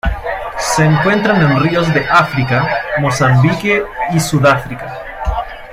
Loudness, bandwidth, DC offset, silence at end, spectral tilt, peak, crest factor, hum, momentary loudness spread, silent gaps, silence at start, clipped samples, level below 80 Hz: -13 LUFS; 16 kHz; under 0.1%; 0 s; -5.5 dB/octave; 0 dBFS; 14 dB; none; 10 LU; none; 0.05 s; under 0.1%; -30 dBFS